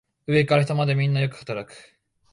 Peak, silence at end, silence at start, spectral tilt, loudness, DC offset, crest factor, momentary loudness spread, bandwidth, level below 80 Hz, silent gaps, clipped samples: -8 dBFS; 0.55 s; 0.3 s; -7 dB/octave; -23 LUFS; under 0.1%; 16 dB; 13 LU; 11 kHz; -60 dBFS; none; under 0.1%